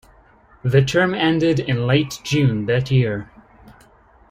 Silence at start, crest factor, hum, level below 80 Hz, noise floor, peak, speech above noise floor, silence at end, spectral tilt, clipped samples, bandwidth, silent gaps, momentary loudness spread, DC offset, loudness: 0.65 s; 18 dB; none; -48 dBFS; -51 dBFS; -2 dBFS; 33 dB; 0.6 s; -6.5 dB/octave; under 0.1%; 14.5 kHz; none; 5 LU; under 0.1%; -19 LUFS